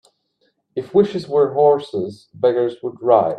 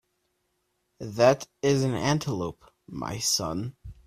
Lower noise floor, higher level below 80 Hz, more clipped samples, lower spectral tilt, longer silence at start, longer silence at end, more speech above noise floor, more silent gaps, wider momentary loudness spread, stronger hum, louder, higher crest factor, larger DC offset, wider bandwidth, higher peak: second, -66 dBFS vs -75 dBFS; second, -62 dBFS vs -54 dBFS; neither; first, -8 dB/octave vs -4.5 dB/octave; second, 0.75 s vs 1 s; second, 0 s vs 0.15 s; about the same, 49 dB vs 49 dB; neither; second, 13 LU vs 16 LU; neither; first, -18 LUFS vs -26 LUFS; about the same, 18 dB vs 22 dB; neither; second, 9 kHz vs 15.5 kHz; first, 0 dBFS vs -6 dBFS